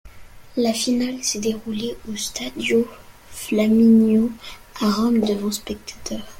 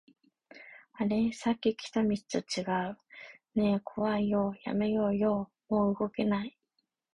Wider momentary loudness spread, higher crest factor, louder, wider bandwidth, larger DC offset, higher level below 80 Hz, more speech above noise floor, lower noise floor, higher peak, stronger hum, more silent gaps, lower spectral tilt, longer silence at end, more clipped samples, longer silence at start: about the same, 16 LU vs 15 LU; about the same, 14 dB vs 16 dB; first, -21 LUFS vs -31 LUFS; first, 16.5 kHz vs 10.5 kHz; neither; first, -48 dBFS vs -62 dBFS; second, 20 dB vs 50 dB; second, -41 dBFS vs -80 dBFS; first, -6 dBFS vs -16 dBFS; neither; neither; second, -4.5 dB/octave vs -6.5 dB/octave; second, 0.05 s vs 0.65 s; neither; second, 0.05 s vs 0.55 s